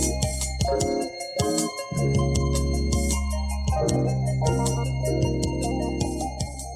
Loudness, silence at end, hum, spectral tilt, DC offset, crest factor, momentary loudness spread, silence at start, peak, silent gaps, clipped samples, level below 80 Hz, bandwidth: -25 LUFS; 0 s; none; -5 dB/octave; under 0.1%; 18 dB; 5 LU; 0 s; -6 dBFS; none; under 0.1%; -30 dBFS; 14.5 kHz